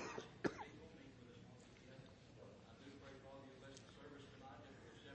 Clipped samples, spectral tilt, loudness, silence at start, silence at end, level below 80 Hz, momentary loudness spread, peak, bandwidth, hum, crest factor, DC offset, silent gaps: under 0.1%; -5 dB/octave; -56 LUFS; 0 s; 0 s; -76 dBFS; 15 LU; -26 dBFS; 8.4 kHz; none; 30 dB; under 0.1%; none